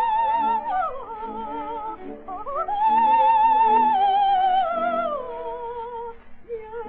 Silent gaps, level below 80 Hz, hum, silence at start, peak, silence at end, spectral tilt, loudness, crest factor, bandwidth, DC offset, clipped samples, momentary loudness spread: none; -52 dBFS; 50 Hz at -60 dBFS; 0 s; -10 dBFS; 0 s; -1.5 dB/octave; -21 LUFS; 12 dB; 4.2 kHz; under 0.1%; under 0.1%; 17 LU